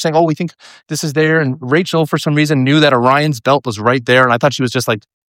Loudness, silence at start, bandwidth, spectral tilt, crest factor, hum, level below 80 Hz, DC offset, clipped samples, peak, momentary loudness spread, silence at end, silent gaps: -13 LUFS; 0 s; 16.5 kHz; -5.5 dB/octave; 14 dB; none; -60 dBFS; under 0.1%; under 0.1%; 0 dBFS; 9 LU; 0.3 s; none